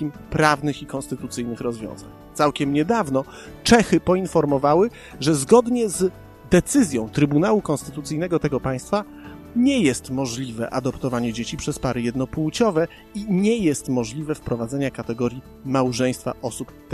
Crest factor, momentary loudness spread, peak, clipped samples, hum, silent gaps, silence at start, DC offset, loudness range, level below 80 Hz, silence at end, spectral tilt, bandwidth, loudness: 22 dB; 12 LU; 0 dBFS; under 0.1%; none; none; 0 s; under 0.1%; 5 LU; -46 dBFS; 0 s; -5.5 dB/octave; 13.5 kHz; -22 LUFS